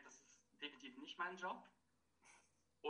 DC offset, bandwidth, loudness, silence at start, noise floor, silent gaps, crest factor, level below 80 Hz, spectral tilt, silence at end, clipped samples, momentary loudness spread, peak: under 0.1%; 10 kHz; -51 LUFS; 0 s; -81 dBFS; none; 22 dB; under -90 dBFS; -2.5 dB/octave; 0 s; under 0.1%; 22 LU; -32 dBFS